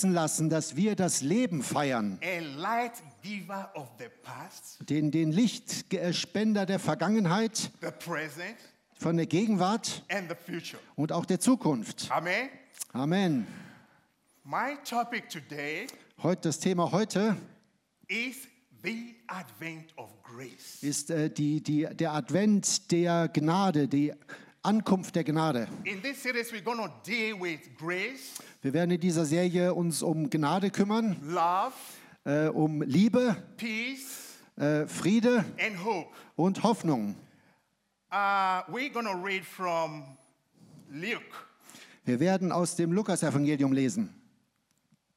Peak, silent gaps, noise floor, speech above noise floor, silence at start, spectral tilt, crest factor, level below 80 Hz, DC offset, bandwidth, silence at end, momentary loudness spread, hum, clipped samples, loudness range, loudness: -12 dBFS; none; -76 dBFS; 46 dB; 0 s; -5 dB/octave; 18 dB; -80 dBFS; under 0.1%; 16 kHz; 1.05 s; 15 LU; none; under 0.1%; 6 LU; -30 LUFS